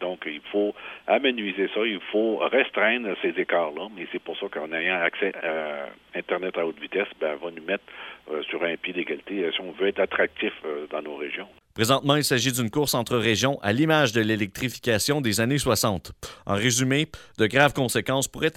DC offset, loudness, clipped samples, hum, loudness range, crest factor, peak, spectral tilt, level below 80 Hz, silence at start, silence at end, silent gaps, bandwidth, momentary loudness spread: under 0.1%; -25 LUFS; under 0.1%; none; 6 LU; 24 dB; -2 dBFS; -4 dB/octave; -56 dBFS; 0 s; 0.05 s; none; 16.5 kHz; 12 LU